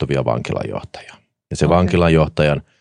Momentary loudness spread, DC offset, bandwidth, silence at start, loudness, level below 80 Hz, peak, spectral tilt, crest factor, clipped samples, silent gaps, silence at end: 16 LU; under 0.1%; 10.5 kHz; 0 s; -17 LUFS; -36 dBFS; 0 dBFS; -7 dB/octave; 16 dB; under 0.1%; none; 0.2 s